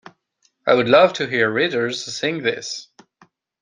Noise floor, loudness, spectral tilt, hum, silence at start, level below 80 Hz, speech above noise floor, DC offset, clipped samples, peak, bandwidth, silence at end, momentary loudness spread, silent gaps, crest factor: -66 dBFS; -19 LUFS; -4 dB/octave; none; 0.65 s; -64 dBFS; 47 dB; under 0.1%; under 0.1%; -2 dBFS; 9.8 kHz; 0.8 s; 13 LU; none; 18 dB